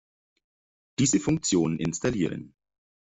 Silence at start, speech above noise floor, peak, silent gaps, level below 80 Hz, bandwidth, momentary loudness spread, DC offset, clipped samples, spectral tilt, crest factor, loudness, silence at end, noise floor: 1 s; over 65 dB; -12 dBFS; none; -56 dBFS; 8.2 kHz; 10 LU; under 0.1%; under 0.1%; -4.5 dB/octave; 16 dB; -26 LUFS; 0.55 s; under -90 dBFS